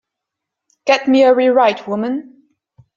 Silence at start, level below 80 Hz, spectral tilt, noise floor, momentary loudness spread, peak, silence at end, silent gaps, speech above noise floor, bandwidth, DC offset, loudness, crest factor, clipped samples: 0.85 s; -66 dBFS; -5 dB/octave; -81 dBFS; 12 LU; -2 dBFS; 0.75 s; none; 67 dB; 7.4 kHz; under 0.1%; -14 LUFS; 16 dB; under 0.1%